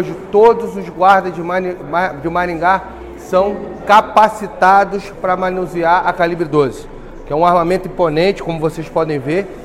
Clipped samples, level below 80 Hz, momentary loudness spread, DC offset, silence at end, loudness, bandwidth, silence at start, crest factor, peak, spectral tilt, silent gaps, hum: under 0.1%; -38 dBFS; 9 LU; under 0.1%; 0 s; -15 LUFS; 15.5 kHz; 0 s; 14 dB; 0 dBFS; -6 dB/octave; none; none